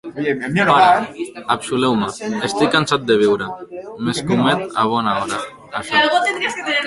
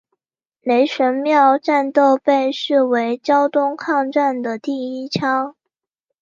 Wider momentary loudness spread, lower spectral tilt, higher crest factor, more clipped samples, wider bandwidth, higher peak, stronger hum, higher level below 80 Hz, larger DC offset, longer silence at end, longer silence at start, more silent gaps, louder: first, 13 LU vs 10 LU; about the same, -4.5 dB/octave vs -5.5 dB/octave; about the same, 16 dB vs 16 dB; neither; first, 11.5 kHz vs 7.4 kHz; about the same, 0 dBFS vs -2 dBFS; neither; first, -54 dBFS vs -70 dBFS; neither; second, 0 s vs 0.7 s; second, 0.05 s vs 0.65 s; neither; about the same, -17 LUFS vs -17 LUFS